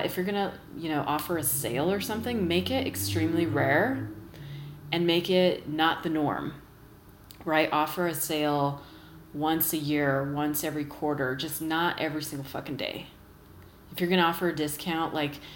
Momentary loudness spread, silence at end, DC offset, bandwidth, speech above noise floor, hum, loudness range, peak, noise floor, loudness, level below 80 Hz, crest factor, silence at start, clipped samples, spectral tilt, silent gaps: 15 LU; 0 s; under 0.1%; 17 kHz; 23 dB; none; 3 LU; -10 dBFS; -51 dBFS; -28 LUFS; -58 dBFS; 20 dB; 0 s; under 0.1%; -4.5 dB/octave; none